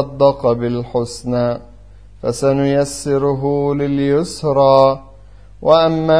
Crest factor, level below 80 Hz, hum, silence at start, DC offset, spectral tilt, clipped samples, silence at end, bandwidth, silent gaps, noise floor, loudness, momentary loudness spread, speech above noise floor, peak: 16 dB; -42 dBFS; none; 0 s; 0.6%; -6.5 dB/octave; under 0.1%; 0 s; 11 kHz; none; -41 dBFS; -16 LUFS; 9 LU; 26 dB; 0 dBFS